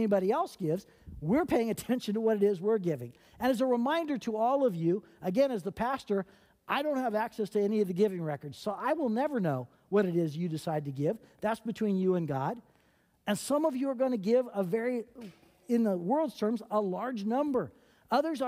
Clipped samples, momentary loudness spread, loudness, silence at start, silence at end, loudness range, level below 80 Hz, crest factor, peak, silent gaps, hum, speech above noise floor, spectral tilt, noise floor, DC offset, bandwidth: under 0.1%; 9 LU; -31 LUFS; 0 s; 0 s; 2 LU; -66 dBFS; 16 dB; -14 dBFS; none; none; 38 dB; -6.5 dB/octave; -68 dBFS; under 0.1%; 16 kHz